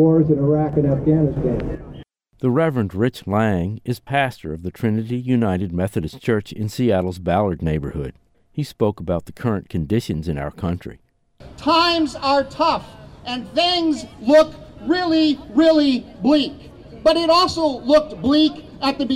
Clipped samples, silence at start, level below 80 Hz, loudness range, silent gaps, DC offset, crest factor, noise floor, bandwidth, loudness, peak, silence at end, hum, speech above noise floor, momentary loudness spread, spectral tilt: under 0.1%; 0 s; -42 dBFS; 6 LU; none; under 0.1%; 14 dB; -45 dBFS; 15 kHz; -19 LUFS; -6 dBFS; 0 s; none; 27 dB; 12 LU; -6.5 dB/octave